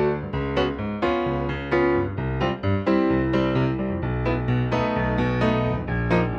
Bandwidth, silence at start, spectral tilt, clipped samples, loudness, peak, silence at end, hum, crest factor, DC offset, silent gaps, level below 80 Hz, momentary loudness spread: 6.8 kHz; 0 s; -8.5 dB/octave; under 0.1%; -23 LUFS; -8 dBFS; 0 s; none; 14 dB; under 0.1%; none; -36 dBFS; 5 LU